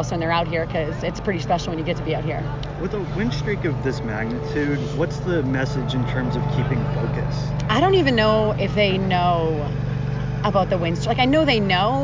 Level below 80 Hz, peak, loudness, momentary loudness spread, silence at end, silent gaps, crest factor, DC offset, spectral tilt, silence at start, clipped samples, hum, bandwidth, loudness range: -36 dBFS; -4 dBFS; -22 LUFS; 8 LU; 0 s; none; 16 dB; under 0.1%; -6.5 dB/octave; 0 s; under 0.1%; none; 7.6 kHz; 5 LU